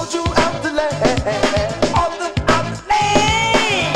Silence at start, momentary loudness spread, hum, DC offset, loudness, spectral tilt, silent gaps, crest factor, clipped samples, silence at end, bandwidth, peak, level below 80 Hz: 0 s; 5 LU; none; 0.3%; -17 LUFS; -4 dB/octave; none; 16 dB; under 0.1%; 0 s; 15.5 kHz; 0 dBFS; -32 dBFS